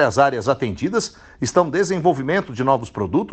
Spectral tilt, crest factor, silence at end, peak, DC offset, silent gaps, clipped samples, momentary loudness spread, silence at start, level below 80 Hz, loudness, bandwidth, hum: -5.5 dB/octave; 16 dB; 0 s; -2 dBFS; under 0.1%; none; under 0.1%; 5 LU; 0 s; -52 dBFS; -20 LUFS; 9 kHz; none